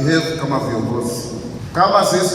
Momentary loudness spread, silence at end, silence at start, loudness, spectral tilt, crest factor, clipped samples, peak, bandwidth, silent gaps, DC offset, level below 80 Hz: 12 LU; 0 s; 0 s; -18 LUFS; -5 dB/octave; 18 dB; under 0.1%; 0 dBFS; 17 kHz; none; under 0.1%; -44 dBFS